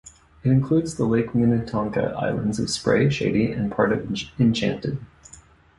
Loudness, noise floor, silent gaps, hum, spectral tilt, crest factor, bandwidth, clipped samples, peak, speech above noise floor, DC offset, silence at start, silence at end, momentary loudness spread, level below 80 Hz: -23 LUFS; -50 dBFS; none; none; -6.5 dB/octave; 18 dB; 11.5 kHz; under 0.1%; -4 dBFS; 28 dB; under 0.1%; 0.05 s; 0.75 s; 6 LU; -48 dBFS